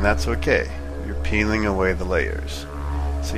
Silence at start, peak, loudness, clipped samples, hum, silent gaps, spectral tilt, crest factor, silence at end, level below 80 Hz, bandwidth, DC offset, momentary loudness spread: 0 s; -4 dBFS; -23 LUFS; under 0.1%; none; none; -6 dB/octave; 18 dB; 0 s; -26 dBFS; 14 kHz; under 0.1%; 10 LU